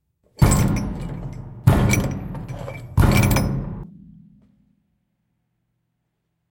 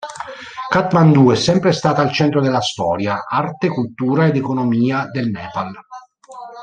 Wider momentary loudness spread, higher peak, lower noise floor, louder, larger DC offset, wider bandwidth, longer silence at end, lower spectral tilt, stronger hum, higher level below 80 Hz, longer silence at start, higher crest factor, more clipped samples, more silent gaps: about the same, 16 LU vs 17 LU; about the same, 0 dBFS vs -2 dBFS; first, -74 dBFS vs -37 dBFS; second, -20 LUFS vs -16 LUFS; neither; first, 17 kHz vs 9.4 kHz; first, 2.6 s vs 0 s; about the same, -6 dB/octave vs -6.5 dB/octave; neither; first, -30 dBFS vs -54 dBFS; first, 0.4 s vs 0 s; first, 22 dB vs 16 dB; neither; neither